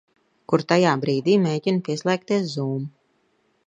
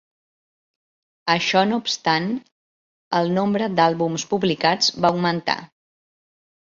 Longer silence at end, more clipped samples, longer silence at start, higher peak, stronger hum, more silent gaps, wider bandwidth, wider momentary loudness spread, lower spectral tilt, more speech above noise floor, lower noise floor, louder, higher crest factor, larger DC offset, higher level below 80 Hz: second, 0.8 s vs 1 s; neither; second, 0.5 s vs 1.25 s; about the same, -4 dBFS vs -4 dBFS; neither; second, none vs 2.52-3.11 s; first, 9.4 kHz vs 7.6 kHz; about the same, 9 LU vs 7 LU; first, -6.5 dB/octave vs -4.5 dB/octave; second, 45 dB vs over 70 dB; second, -66 dBFS vs under -90 dBFS; about the same, -22 LUFS vs -21 LUFS; about the same, 20 dB vs 20 dB; neither; second, -70 dBFS vs -64 dBFS